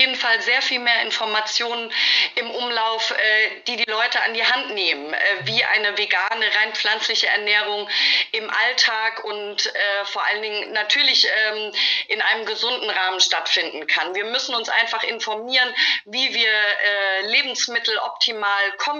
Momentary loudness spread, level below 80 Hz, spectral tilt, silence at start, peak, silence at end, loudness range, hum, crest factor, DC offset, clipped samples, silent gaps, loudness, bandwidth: 6 LU; -80 dBFS; 0 dB/octave; 0 s; -2 dBFS; 0 s; 1 LU; none; 18 dB; under 0.1%; under 0.1%; none; -19 LUFS; 7.6 kHz